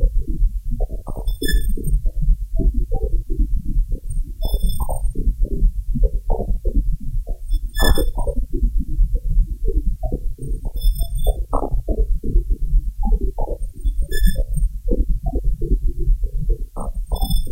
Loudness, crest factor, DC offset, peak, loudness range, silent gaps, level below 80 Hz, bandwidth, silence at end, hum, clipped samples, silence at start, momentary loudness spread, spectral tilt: -25 LUFS; 16 dB; under 0.1%; 0 dBFS; 1 LU; none; -18 dBFS; 16 kHz; 0 s; none; under 0.1%; 0 s; 6 LU; -6 dB/octave